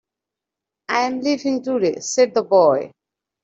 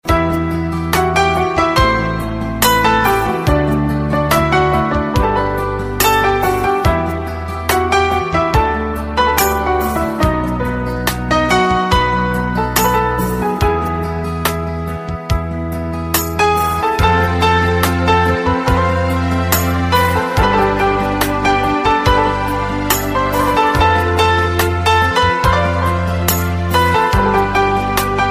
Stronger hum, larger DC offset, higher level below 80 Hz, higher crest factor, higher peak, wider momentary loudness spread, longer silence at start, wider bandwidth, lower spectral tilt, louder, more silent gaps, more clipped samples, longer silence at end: neither; neither; second, -70 dBFS vs -26 dBFS; about the same, 18 dB vs 14 dB; second, -4 dBFS vs 0 dBFS; first, 9 LU vs 6 LU; first, 0.9 s vs 0.05 s; second, 8.2 kHz vs 16 kHz; about the same, -4 dB/octave vs -5 dB/octave; second, -19 LUFS vs -15 LUFS; neither; neither; first, 0.55 s vs 0 s